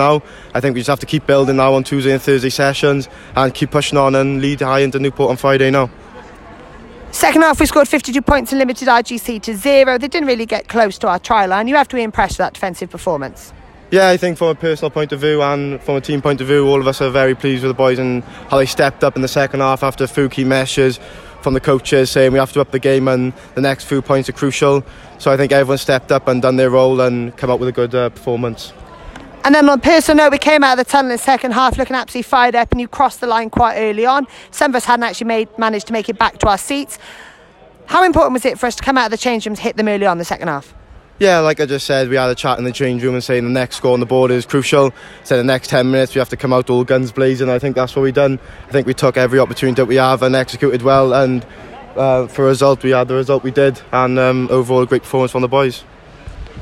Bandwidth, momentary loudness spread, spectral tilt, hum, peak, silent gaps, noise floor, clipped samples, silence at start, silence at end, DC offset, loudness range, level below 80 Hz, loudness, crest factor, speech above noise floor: 16.5 kHz; 8 LU; -5.5 dB/octave; none; 0 dBFS; none; -43 dBFS; under 0.1%; 0 s; 0 s; under 0.1%; 3 LU; -38 dBFS; -14 LUFS; 14 dB; 29 dB